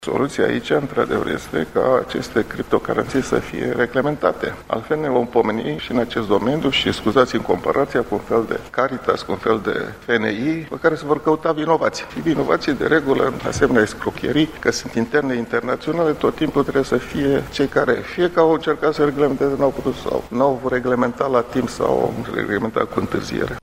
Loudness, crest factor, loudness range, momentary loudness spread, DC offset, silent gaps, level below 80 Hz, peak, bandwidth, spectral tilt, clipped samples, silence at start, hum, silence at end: -20 LUFS; 20 dB; 2 LU; 5 LU; under 0.1%; none; -44 dBFS; 0 dBFS; 16 kHz; -5.5 dB/octave; under 0.1%; 0 s; none; 0.05 s